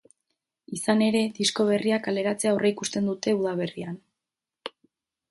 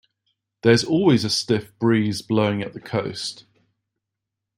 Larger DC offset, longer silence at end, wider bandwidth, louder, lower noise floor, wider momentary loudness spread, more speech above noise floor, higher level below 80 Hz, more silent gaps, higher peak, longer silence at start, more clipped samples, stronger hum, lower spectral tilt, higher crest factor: neither; second, 0.65 s vs 1.2 s; second, 12 kHz vs 16 kHz; second, -25 LUFS vs -21 LUFS; first, -88 dBFS vs -83 dBFS; first, 18 LU vs 11 LU; about the same, 63 dB vs 63 dB; second, -70 dBFS vs -60 dBFS; neither; second, -8 dBFS vs -4 dBFS; about the same, 0.7 s vs 0.65 s; neither; neither; about the same, -4.5 dB/octave vs -5.5 dB/octave; about the same, 18 dB vs 20 dB